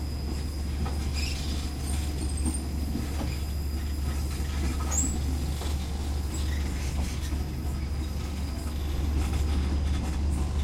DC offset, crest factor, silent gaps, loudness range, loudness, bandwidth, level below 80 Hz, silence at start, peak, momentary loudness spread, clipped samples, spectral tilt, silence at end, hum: under 0.1%; 14 dB; none; 1 LU; -31 LUFS; 16 kHz; -30 dBFS; 0 s; -14 dBFS; 4 LU; under 0.1%; -5 dB/octave; 0 s; none